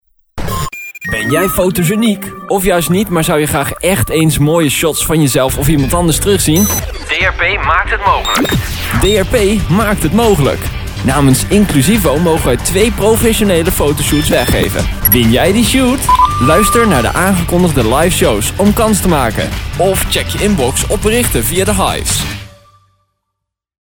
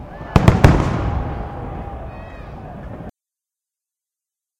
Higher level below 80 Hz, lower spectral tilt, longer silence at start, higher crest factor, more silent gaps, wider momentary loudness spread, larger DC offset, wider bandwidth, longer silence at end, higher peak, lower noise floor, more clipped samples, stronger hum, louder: about the same, -24 dBFS vs -28 dBFS; second, -4.5 dB/octave vs -7.5 dB/octave; first, 0.35 s vs 0 s; second, 12 dB vs 20 dB; neither; second, 6 LU vs 22 LU; neither; first, over 20 kHz vs 16.5 kHz; about the same, 1.5 s vs 1.5 s; about the same, 0 dBFS vs 0 dBFS; second, -75 dBFS vs -87 dBFS; about the same, 0.1% vs 0.1%; neither; first, -11 LUFS vs -17 LUFS